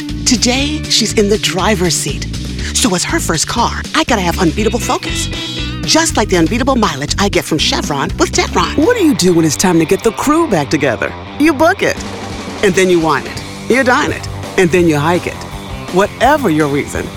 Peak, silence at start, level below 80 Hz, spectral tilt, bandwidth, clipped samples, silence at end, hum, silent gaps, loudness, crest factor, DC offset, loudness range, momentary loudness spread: 0 dBFS; 0 s; -28 dBFS; -4 dB/octave; 18 kHz; under 0.1%; 0 s; none; none; -13 LUFS; 14 dB; under 0.1%; 2 LU; 8 LU